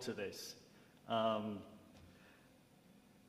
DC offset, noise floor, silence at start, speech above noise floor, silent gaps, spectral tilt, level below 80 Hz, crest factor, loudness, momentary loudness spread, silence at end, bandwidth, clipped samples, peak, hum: under 0.1%; -67 dBFS; 0 s; 26 dB; none; -4.5 dB/octave; -82 dBFS; 22 dB; -42 LUFS; 26 LU; 0.3 s; 15.5 kHz; under 0.1%; -24 dBFS; none